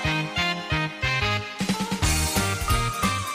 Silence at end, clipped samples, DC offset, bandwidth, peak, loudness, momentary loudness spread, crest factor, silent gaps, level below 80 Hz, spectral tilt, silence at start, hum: 0 s; under 0.1%; under 0.1%; 15.5 kHz; -10 dBFS; -24 LUFS; 4 LU; 16 dB; none; -34 dBFS; -3.5 dB/octave; 0 s; none